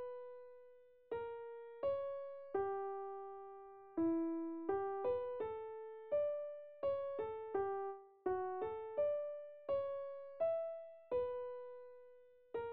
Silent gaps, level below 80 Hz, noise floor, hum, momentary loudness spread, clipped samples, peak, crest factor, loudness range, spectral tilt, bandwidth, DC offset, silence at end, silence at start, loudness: none; -76 dBFS; -64 dBFS; none; 13 LU; under 0.1%; -28 dBFS; 16 dB; 3 LU; -6 dB/octave; 4.3 kHz; under 0.1%; 0 s; 0 s; -43 LUFS